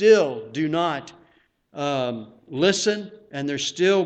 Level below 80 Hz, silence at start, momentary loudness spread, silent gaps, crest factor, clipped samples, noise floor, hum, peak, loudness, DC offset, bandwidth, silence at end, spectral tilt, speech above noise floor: -66 dBFS; 0 s; 15 LU; none; 18 dB; under 0.1%; -61 dBFS; none; -4 dBFS; -23 LUFS; under 0.1%; 8.8 kHz; 0 s; -4 dB/octave; 39 dB